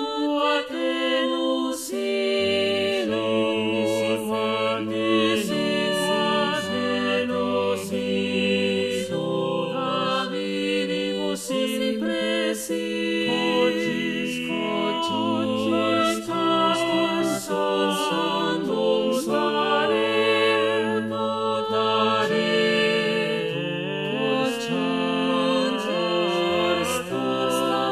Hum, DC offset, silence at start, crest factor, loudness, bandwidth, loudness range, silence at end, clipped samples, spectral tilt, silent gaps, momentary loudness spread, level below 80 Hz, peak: none; under 0.1%; 0 s; 14 dB; -23 LUFS; 15 kHz; 3 LU; 0 s; under 0.1%; -4.5 dB/octave; none; 5 LU; -62 dBFS; -8 dBFS